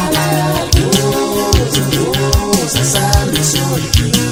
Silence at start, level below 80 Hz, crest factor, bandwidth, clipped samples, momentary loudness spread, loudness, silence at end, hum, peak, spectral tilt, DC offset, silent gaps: 0 s; -22 dBFS; 12 dB; over 20 kHz; under 0.1%; 2 LU; -13 LUFS; 0 s; none; 0 dBFS; -4 dB/octave; under 0.1%; none